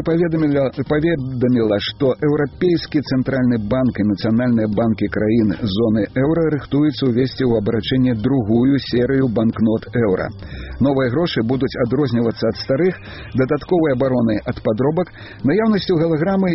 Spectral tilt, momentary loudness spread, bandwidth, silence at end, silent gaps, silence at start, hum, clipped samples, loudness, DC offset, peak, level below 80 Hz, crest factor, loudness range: -6.5 dB/octave; 3 LU; 6 kHz; 0 s; none; 0 s; none; under 0.1%; -18 LUFS; 0.1%; -4 dBFS; -40 dBFS; 12 dB; 2 LU